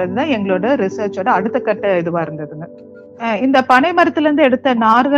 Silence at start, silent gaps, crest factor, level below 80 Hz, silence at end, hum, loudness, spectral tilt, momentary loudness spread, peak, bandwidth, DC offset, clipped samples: 0 s; none; 14 dB; -58 dBFS; 0 s; none; -15 LUFS; -6.5 dB/octave; 13 LU; 0 dBFS; 9 kHz; under 0.1%; under 0.1%